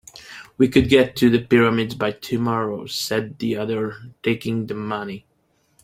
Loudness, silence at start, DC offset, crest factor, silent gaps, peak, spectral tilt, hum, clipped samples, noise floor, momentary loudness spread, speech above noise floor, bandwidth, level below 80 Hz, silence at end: -21 LUFS; 0.15 s; under 0.1%; 20 dB; none; -2 dBFS; -5.5 dB/octave; none; under 0.1%; -65 dBFS; 14 LU; 44 dB; 16 kHz; -48 dBFS; 0.65 s